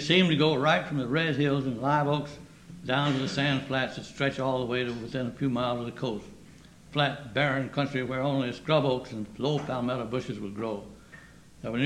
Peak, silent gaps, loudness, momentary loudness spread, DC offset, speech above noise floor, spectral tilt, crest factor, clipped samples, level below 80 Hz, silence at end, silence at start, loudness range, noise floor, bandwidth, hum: -8 dBFS; none; -28 LUFS; 10 LU; under 0.1%; 24 dB; -6 dB/octave; 20 dB; under 0.1%; -58 dBFS; 0 s; 0 s; 4 LU; -51 dBFS; 11 kHz; none